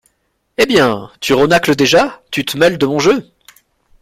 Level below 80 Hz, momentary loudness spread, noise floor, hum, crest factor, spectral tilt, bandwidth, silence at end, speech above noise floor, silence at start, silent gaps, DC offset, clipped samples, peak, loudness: -46 dBFS; 8 LU; -65 dBFS; none; 14 dB; -4.5 dB/octave; 16 kHz; 0.8 s; 52 dB; 0.6 s; none; under 0.1%; under 0.1%; 0 dBFS; -13 LUFS